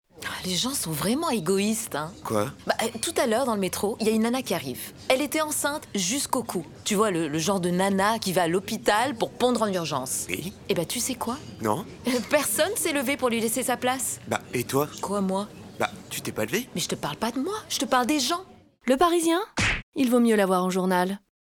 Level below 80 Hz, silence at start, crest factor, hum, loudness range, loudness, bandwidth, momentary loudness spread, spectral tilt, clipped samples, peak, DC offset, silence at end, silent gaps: -52 dBFS; 0.15 s; 18 dB; none; 4 LU; -26 LUFS; over 20 kHz; 8 LU; -3.5 dB/octave; under 0.1%; -8 dBFS; under 0.1%; 0.25 s; 19.83-19.92 s